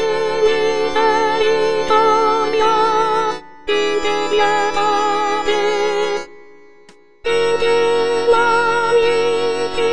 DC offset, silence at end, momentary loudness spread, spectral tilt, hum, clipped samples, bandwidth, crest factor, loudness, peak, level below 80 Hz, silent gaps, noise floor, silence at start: 4%; 0 s; 5 LU; -3 dB/octave; none; under 0.1%; 10 kHz; 14 dB; -16 LUFS; -2 dBFS; -50 dBFS; none; -48 dBFS; 0 s